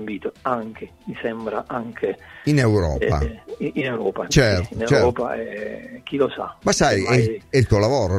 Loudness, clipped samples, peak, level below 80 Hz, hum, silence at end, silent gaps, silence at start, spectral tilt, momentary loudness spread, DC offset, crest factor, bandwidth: -21 LUFS; under 0.1%; 0 dBFS; -36 dBFS; none; 0 s; none; 0 s; -5.5 dB/octave; 12 LU; under 0.1%; 20 dB; 13.5 kHz